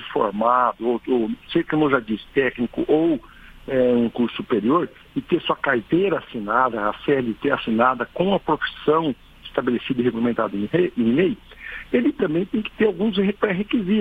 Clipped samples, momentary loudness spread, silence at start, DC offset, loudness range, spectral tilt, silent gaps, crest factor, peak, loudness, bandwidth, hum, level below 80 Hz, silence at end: under 0.1%; 6 LU; 0 s; under 0.1%; 1 LU; -8.5 dB/octave; none; 18 dB; -4 dBFS; -22 LUFS; 4.8 kHz; none; -50 dBFS; 0 s